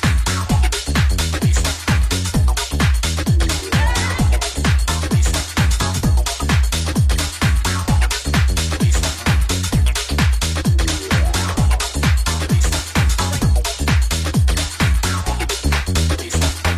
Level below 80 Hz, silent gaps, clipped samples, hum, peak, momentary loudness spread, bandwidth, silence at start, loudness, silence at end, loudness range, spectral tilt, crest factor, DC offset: -20 dBFS; none; under 0.1%; none; -4 dBFS; 1 LU; 15.5 kHz; 0 s; -18 LUFS; 0 s; 0 LU; -4 dB/octave; 12 dB; under 0.1%